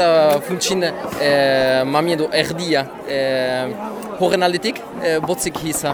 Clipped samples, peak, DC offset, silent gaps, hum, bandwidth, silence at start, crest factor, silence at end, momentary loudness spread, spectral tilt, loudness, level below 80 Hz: under 0.1%; -2 dBFS; under 0.1%; none; none; over 20 kHz; 0 s; 16 dB; 0 s; 8 LU; -4 dB/octave; -18 LUFS; -52 dBFS